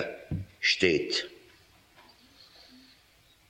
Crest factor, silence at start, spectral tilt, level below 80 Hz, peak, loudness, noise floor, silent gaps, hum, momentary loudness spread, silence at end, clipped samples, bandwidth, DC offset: 26 dB; 0 s; -3.5 dB/octave; -58 dBFS; -8 dBFS; -28 LUFS; -62 dBFS; none; none; 14 LU; 2.15 s; under 0.1%; 15.5 kHz; under 0.1%